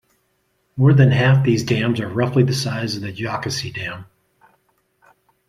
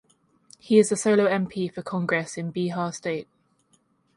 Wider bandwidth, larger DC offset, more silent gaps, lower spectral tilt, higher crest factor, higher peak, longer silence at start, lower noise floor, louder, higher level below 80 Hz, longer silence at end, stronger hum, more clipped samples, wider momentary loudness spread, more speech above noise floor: first, 13 kHz vs 11.5 kHz; neither; neither; about the same, -6.5 dB/octave vs -5.5 dB/octave; about the same, 18 dB vs 20 dB; first, -2 dBFS vs -6 dBFS; about the same, 0.75 s vs 0.65 s; about the same, -67 dBFS vs -66 dBFS; first, -18 LUFS vs -24 LUFS; first, -52 dBFS vs -68 dBFS; first, 1.45 s vs 0.95 s; neither; neither; first, 14 LU vs 11 LU; first, 49 dB vs 42 dB